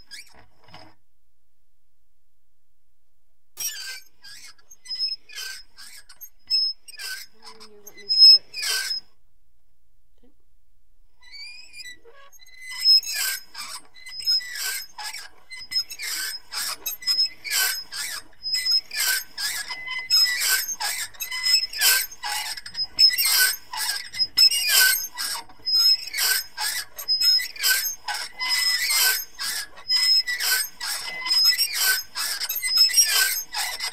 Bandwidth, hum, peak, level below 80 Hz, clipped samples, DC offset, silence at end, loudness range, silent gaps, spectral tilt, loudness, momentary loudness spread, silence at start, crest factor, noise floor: 16 kHz; none; -4 dBFS; -62 dBFS; under 0.1%; 0.7%; 0 s; 14 LU; none; 4 dB/octave; -20 LUFS; 18 LU; 0.1 s; 22 dB; -75 dBFS